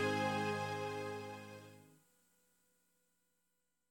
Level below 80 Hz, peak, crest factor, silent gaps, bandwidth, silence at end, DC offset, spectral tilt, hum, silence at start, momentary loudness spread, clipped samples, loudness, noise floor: -82 dBFS; -24 dBFS; 18 dB; none; 17.5 kHz; 2.05 s; under 0.1%; -5 dB/octave; 60 Hz at -85 dBFS; 0 s; 18 LU; under 0.1%; -40 LUFS; -86 dBFS